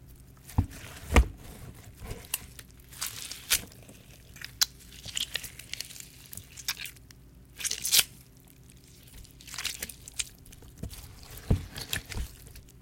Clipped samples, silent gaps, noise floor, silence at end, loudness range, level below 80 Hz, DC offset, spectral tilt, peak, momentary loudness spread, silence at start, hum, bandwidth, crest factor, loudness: under 0.1%; none; -54 dBFS; 0 s; 6 LU; -40 dBFS; under 0.1%; -2.5 dB/octave; -4 dBFS; 25 LU; 0 s; none; 17 kHz; 30 dB; -31 LUFS